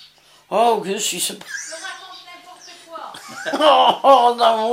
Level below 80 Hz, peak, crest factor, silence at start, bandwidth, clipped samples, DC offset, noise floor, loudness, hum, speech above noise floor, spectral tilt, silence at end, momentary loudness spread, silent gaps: -70 dBFS; -2 dBFS; 18 dB; 0.5 s; 16 kHz; under 0.1%; under 0.1%; -49 dBFS; -16 LUFS; none; 33 dB; -2 dB/octave; 0 s; 22 LU; none